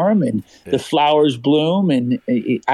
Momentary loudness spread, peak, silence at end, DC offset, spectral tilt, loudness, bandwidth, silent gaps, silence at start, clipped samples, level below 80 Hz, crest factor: 8 LU; -6 dBFS; 0 s; under 0.1%; -7 dB/octave; -17 LUFS; 12.5 kHz; none; 0 s; under 0.1%; -60 dBFS; 10 dB